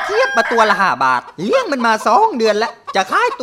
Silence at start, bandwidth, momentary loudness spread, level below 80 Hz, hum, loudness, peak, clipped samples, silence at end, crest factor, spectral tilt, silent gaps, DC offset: 0 s; 16 kHz; 6 LU; -60 dBFS; none; -15 LUFS; 0 dBFS; under 0.1%; 0 s; 14 dB; -3.5 dB/octave; none; under 0.1%